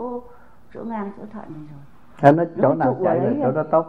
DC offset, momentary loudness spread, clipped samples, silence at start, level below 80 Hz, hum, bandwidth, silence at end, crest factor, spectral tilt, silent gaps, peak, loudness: 0.7%; 21 LU; under 0.1%; 0 s; -58 dBFS; none; 7.8 kHz; 0 s; 22 dB; -9.5 dB/octave; none; 0 dBFS; -20 LUFS